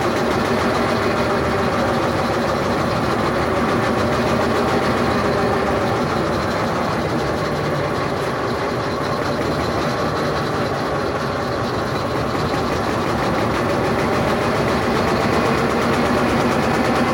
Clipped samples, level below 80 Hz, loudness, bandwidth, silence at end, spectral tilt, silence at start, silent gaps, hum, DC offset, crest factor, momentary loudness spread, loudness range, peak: under 0.1%; -38 dBFS; -19 LUFS; 16.5 kHz; 0 s; -5.5 dB/octave; 0 s; none; none; under 0.1%; 12 dB; 4 LU; 3 LU; -6 dBFS